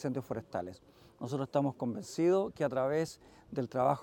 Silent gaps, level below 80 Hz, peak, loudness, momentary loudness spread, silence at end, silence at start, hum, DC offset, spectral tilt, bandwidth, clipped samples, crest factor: none; -68 dBFS; -16 dBFS; -34 LUFS; 12 LU; 0 s; 0 s; none; under 0.1%; -7 dB/octave; 17 kHz; under 0.1%; 18 dB